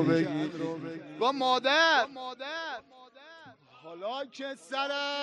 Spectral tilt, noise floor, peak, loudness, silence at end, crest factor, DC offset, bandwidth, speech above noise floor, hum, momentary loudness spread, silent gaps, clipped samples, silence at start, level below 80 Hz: -4.5 dB/octave; -54 dBFS; -10 dBFS; -29 LUFS; 0 s; 20 dB; under 0.1%; 11 kHz; 24 dB; none; 17 LU; none; under 0.1%; 0 s; -78 dBFS